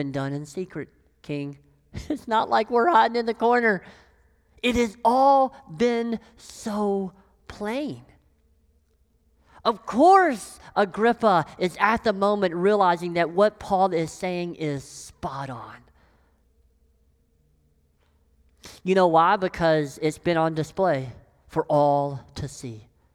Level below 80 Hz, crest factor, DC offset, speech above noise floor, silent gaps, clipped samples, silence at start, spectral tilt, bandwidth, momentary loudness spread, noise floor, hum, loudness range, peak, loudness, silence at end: -54 dBFS; 20 dB; under 0.1%; 42 dB; none; under 0.1%; 0 s; -5.5 dB/octave; 15.5 kHz; 16 LU; -64 dBFS; none; 11 LU; -4 dBFS; -23 LUFS; 0.35 s